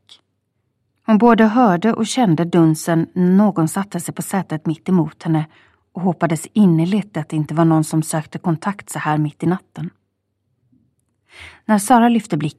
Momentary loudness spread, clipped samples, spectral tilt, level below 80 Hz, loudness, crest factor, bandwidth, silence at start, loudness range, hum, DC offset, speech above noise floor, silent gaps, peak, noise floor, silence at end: 12 LU; under 0.1%; -6.5 dB/octave; -58 dBFS; -17 LUFS; 18 dB; 14 kHz; 1.1 s; 8 LU; none; under 0.1%; 54 dB; none; 0 dBFS; -70 dBFS; 0.05 s